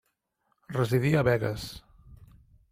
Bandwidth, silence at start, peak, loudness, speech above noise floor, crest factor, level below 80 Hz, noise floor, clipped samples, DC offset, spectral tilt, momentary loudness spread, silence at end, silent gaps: 16 kHz; 0.7 s; -12 dBFS; -27 LUFS; 50 dB; 18 dB; -54 dBFS; -76 dBFS; under 0.1%; under 0.1%; -7 dB/octave; 16 LU; 0.45 s; none